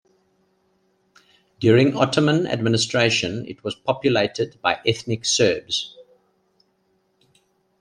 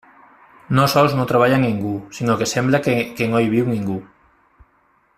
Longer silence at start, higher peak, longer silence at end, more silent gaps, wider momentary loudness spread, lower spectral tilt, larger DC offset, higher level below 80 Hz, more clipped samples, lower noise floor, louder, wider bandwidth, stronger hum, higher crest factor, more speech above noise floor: first, 1.6 s vs 0.7 s; about the same, -2 dBFS vs -2 dBFS; first, 1.8 s vs 1.15 s; neither; about the same, 10 LU vs 9 LU; second, -4.5 dB/octave vs -6 dB/octave; neither; second, -60 dBFS vs -52 dBFS; neither; first, -67 dBFS vs -59 dBFS; about the same, -20 LUFS vs -18 LUFS; second, 10.5 kHz vs 15.5 kHz; neither; about the same, 20 dB vs 16 dB; first, 46 dB vs 42 dB